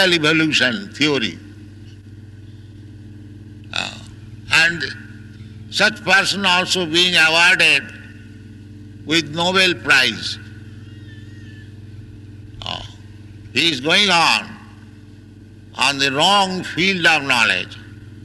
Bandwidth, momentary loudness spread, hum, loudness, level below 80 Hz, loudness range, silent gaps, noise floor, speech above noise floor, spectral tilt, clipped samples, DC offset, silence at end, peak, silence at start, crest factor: 12 kHz; 25 LU; none; -15 LUFS; -50 dBFS; 11 LU; none; -41 dBFS; 24 dB; -2.5 dB/octave; under 0.1%; under 0.1%; 0 s; -4 dBFS; 0 s; 16 dB